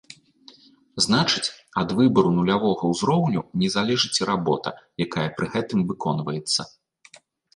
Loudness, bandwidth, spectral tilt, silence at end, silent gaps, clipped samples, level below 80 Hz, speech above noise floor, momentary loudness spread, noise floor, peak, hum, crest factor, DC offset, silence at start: -23 LUFS; 11.5 kHz; -5 dB/octave; 0.85 s; none; under 0.1%; -56 dBFS; 31 dB; 8 LU; -53 dBFS; -6 dBFS; none; 18 dB; under 0.1%; 0.95 s